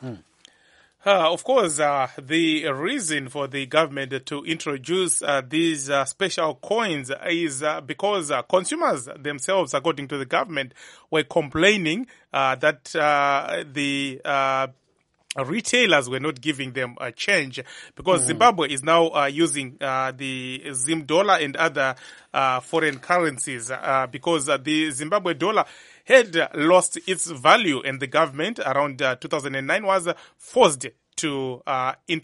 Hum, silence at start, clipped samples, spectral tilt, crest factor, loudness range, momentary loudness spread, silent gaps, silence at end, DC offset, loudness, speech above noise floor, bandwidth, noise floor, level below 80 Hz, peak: none; 0 s; under 0.1%; -3 dB/octave; 22 dB; 4 LU; 11 LU; none; 0.05 s; under 0.1%; -22 LUFS; 45 dB; 11.5 kHz; -67 dBFS; -64 dBFS; 0 dBFS